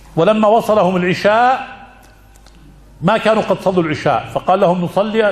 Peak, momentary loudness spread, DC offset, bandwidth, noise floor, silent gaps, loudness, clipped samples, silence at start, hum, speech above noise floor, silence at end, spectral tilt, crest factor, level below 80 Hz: 0 dBFS; 5 LU; under 0.1%; 14 kHz; -43 dBFS; none; -14 LUFS; under 0.1%; 0.15 s; none; 30 dB; 0 s; -6.5 dB/octave; 14 dB; -46 dBFS